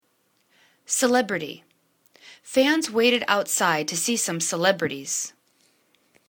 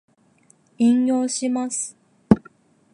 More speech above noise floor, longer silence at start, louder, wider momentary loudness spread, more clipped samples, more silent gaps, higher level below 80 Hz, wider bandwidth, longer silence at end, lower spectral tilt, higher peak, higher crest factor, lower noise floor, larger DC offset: first, 45 dB vs 38 dB; about the same, 0.9 s vs 0.8 s; about the same, -22 LUFS vs -21 LUFS; about the same, 8 LU vs 9 LU; neither; neither; second, -72 dBFS vs -52 dBFS; first, 19.5 kHz vs 11 kHz; first, 1 s vs 0.55 s; second, -2.5 dB/octave vs -5.5 dB/octave; about the same, -2 dBFS vs 0 dBFS; about the same, 22 dB vs 22 dB; first, -68 dBFS vs -58 dBFS; neither